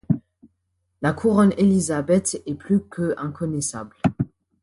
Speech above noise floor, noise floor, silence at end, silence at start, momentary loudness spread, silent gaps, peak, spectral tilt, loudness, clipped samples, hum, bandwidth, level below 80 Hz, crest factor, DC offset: 52 dB; -73 dBFS; 0.35 s; 0.1 s; 10 LU; none; -6 dBFS; -6 dB/octave; -22 LUFS; under 0.1%; none; 11.5 kHz; -50 dBFS; 16 dB; under 0.1%